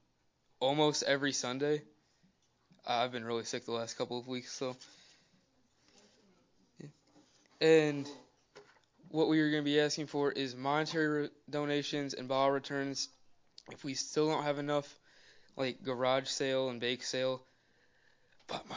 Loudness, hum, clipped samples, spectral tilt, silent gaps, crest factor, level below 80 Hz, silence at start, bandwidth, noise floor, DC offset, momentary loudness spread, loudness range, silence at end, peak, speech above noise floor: -34 LUFS; none; under 0.1%; -4 dB/octave; none; 22 dB; -82 dBFS; 0.6 s; 7.6 kHz; -75 dBFS; under 0.1%; 14 LU; 8 LU; 0 s; -14 dBFS; 41 dB